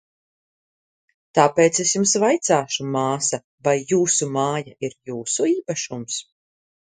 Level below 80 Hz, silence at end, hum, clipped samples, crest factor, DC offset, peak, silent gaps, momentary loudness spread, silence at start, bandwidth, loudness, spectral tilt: -66 dBFS; 0.6 s; none; under 0.1%; 22 dB; under 0.1%; 0 dBFS; 3.44-3.58 s; 12 LU; 1.35 s; 9.8 kHz; -20 LUFS; -3.5 dB/octave